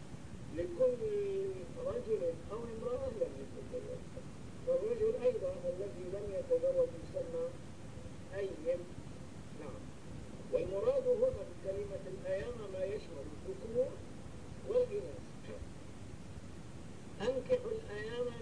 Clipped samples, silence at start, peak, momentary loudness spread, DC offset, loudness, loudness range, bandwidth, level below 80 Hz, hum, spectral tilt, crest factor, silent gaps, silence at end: under 0.1%; 0 s; -22 dBFS; 17 LU; 0.3%; -38 LUFS; 5 LU; 10.5 kHz; -58 dBFS; none; -6.5 dB/octave; 18 dB; none; 0 s